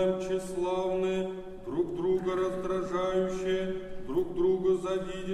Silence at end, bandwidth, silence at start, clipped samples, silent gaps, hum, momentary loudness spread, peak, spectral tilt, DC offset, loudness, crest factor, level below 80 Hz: 0 s; 11 kHz; 0 s; under 0.1%; none; none; 6 LU; -16 dBFS; -6.5 dB/octave; under 0.1%; -31 LUFS; 14 dB; -50 dBFS